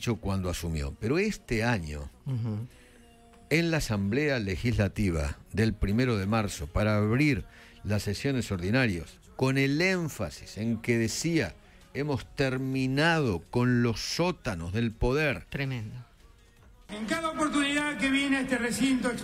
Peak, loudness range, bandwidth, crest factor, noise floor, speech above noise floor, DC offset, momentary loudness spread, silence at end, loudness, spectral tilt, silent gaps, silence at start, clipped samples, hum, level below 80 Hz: -12 dBFS; 3 LU; 16 kHz; 18 dB; -56 dBFS; 28 dB; under 0.1%; 10 LU; 0 s; -29 LUFS; -5.5 dB/octave; none; 0 s; under 0.1%; none; -44 dBFS